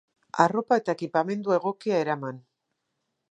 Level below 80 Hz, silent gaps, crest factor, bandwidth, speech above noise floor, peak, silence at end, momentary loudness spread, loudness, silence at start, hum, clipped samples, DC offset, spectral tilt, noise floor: -78 dBFS; none; 24 dB; 9.8 kHz; 54 dB; -4 dBFS; 0.9 s; 12 LU; -26 LUFS; 0.35 s; none; under 0.1%; under 0.1%; -6.5 dB/octave; -80 dBFS